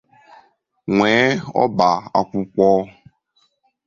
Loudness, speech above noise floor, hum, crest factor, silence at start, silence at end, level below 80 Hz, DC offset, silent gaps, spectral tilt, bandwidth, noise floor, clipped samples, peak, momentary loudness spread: -17 LUFS; 47 dB; none; 18 dB; 0.85 s; 1 s; -56 dBFS; under 0.1%; none; -6 dB/octave; 7.4 kHz; -64 dBFS; under 0.1%; -2 dBFS; 8 LU